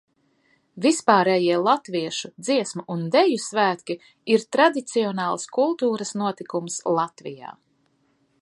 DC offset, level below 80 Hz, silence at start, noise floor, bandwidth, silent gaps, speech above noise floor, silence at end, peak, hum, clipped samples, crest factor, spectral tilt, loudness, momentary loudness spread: under 0.1%; -76 dBFS; 0.75 s; -66 dBFS; 11.5 kHz; none; 44 dB; 0.9 s; -2 dBFS; none; under 0.1%; 22 dB; -4 dB/octave; -22 LUFS; 12 LU